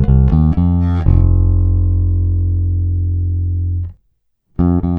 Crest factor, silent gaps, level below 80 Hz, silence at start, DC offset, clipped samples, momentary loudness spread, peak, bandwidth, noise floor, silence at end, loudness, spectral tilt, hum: 12 dB; none; -18 dBFS; 0 s; under 0.1%; under 0.1%; 7 LU; 0 dBFS; 2.3 kHz; -62 dBFS; 0 s; -15 LUFS; -12.5 dB/octave; none